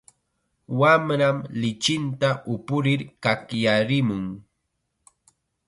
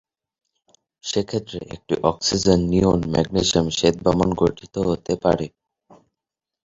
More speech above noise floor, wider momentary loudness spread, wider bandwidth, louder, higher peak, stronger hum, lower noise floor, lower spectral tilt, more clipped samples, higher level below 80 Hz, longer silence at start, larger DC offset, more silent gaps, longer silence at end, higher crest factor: second, 54 dB vs 66 dB; about the same, 11 LU vs 10 LU; first, 11.5 kHz vs 8 kHz; about the same, -23 LUFS vs -21 LUFS; about the same, -4 dBFS vs -2 dBFS; neither; second, -76 dBFS vs -86 dBFS; about the same, -5.5 dB/octave vs -5 dB/octave; neither; second, -60 dBFS vs -42 dBFS; second, 0.7 s vs 1.05 s; neither; neither; about the same, 1.25 s vs 1.2 s; about the same, 20 dB vs 20 dB